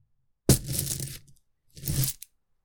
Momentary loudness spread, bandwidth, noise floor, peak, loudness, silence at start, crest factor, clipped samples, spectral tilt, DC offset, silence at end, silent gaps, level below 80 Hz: 19 LU; 19 kHz; -59 dBFS; -6 dBFS; -28 LUFS; 0.5 s; 24 dB; under 0.1%; -4.5 dB/octave; under 0.1%; 0.5 s; none; -42 dBFS